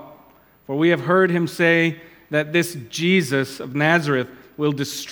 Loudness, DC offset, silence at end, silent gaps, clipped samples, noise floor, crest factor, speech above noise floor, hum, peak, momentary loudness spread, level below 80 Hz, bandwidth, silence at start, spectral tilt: -20 LUFS; under 0.1%; 0 s; none; under 0.1%; -52 dBFS; 20 dB; 32 dB; none; -2 dBFS; 9 LU; -66 dBFS; 19.5 kHz; 0 s; -5.5 dB/octave